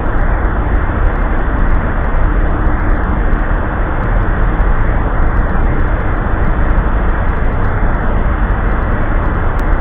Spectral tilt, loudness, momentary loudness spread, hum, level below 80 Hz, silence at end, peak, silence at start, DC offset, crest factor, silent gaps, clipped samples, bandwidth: -10 dB/octave; -16 LUFS; 1 LU; none; -12 dBFS; 0 s; 0 dBFS; 0 s; under 0.1%; 12 dB; none; under 0.1%; 3.7 kHz